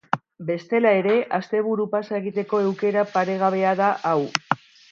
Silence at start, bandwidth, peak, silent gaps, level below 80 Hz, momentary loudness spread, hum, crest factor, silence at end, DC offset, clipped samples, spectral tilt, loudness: 0.15 s; 7.4 kHz; 0 dBFS; none; -74 dBFS; 9 LU; none; 22 dB; 0.35 s; under 0.1%; under 0.1%; -5.5 dB/octave; -22 LUFS